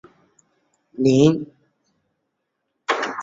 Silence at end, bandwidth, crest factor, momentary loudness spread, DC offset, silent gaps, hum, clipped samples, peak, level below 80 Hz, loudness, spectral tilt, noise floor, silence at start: 0 s; 7.8 kHz; 20 dB; 22 LU; under 0.1%; none; none; under 0.1%; -4 dBFS; -58 dBFS; -19 LUFS; -6.5 dB/octave; -76 dBFS; 1 s